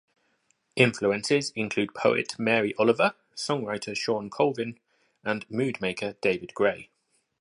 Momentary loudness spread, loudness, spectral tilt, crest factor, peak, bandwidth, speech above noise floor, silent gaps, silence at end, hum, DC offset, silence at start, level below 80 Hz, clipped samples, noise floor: 9 LU; -27 LUFS; -4.5 dB/octave; 22 dB; -6 dBFS; 11.5 kHz; 45 dB; none; 0.55 s; none; under 0.1%; 0.75 s; -68 dBFS; under 0.1%; -71 dBFS